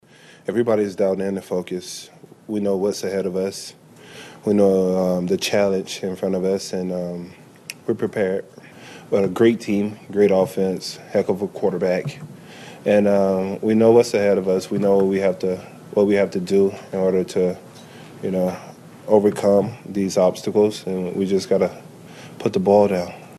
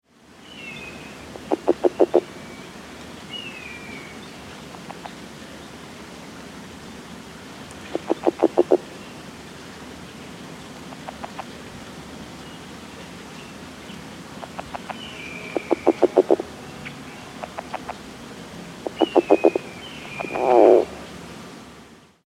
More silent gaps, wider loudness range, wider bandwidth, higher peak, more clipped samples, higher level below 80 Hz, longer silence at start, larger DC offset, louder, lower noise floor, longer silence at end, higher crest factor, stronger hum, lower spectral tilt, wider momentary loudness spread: neither; second, 5 LU vs 17 LU; second, 13 kHz vs 15 kHz; about the same, -2 dBFS vs -2 dBFS; neither; second, -62 dBFS vs -56 dBFS; about the same, 0.5 s vs 0.5 s; neither; first, -20 LUFS vs -23 LUFS; second, -41 dBFS vs -48 dBFS; second, 0 s vs 0.7 s; second, 18 dB vs 24 dB; neither; about the same, -6 dB/octave vs -5.5 dB/octave; second, 17 LU vs 20 LU